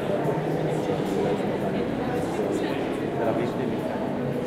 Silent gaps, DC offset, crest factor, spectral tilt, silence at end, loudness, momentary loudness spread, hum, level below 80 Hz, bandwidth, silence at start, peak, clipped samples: none; under 0.1%; 14 dB; -7 dB/octave; 0 s; -27 LUFS; 2 LU; none; -52 dBFS; 16 kHz; 0 s; -12 dBFS; under 0.1%